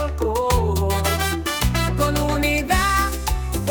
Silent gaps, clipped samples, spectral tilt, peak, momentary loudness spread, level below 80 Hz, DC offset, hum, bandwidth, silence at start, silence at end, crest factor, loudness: none; under 0.1%; -4.5 dB/octave; -6 dBFS; 4 LU; -26 dBFS; under 0.1%; none; 19.5 kHz; 0 s; 0 s; 14 dB; -21 LUFS